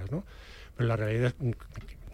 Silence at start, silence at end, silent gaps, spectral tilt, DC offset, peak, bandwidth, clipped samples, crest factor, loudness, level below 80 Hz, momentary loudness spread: 0 s; 0 s; none; -8 dB/octave; under 0.1%; -16 dBFS; 11 kHz; under 0.1%; 16 dB; -31 LUFS; -48 dBFS; 20 LU